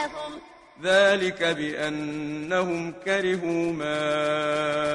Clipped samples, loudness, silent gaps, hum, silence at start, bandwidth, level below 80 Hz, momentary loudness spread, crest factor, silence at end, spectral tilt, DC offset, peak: under 0.1%; -25 LUFS; none; none; 0 s; 11 kHz; -60 dBFS; 12 LU; 18 dB; 0 s; -4.5 dB/octave; under 0.1%; -6 dBFS